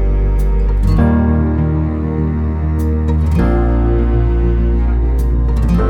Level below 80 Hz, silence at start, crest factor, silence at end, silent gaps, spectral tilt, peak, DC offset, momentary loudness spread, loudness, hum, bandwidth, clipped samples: -14 dBFS; 0 s; 12 dB; 0 s; none; -9.5 dB/octave; 0 dBFS; under 0.1%; 4 LU; -15 LUFS; none; 4.7 kHz; under 0.1%